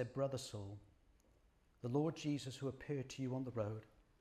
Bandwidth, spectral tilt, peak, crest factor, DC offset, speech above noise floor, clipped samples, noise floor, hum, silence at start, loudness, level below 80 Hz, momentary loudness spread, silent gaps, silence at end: 14 kHz; -6.5 dB/octave; -26 dBFS; 18 dB; under 0.1%; 30 dB; under 0.1%; -73 dBFS; none; 0 s; -44 LUFS; -72 dBFS; 12 LU; none; 0.35 s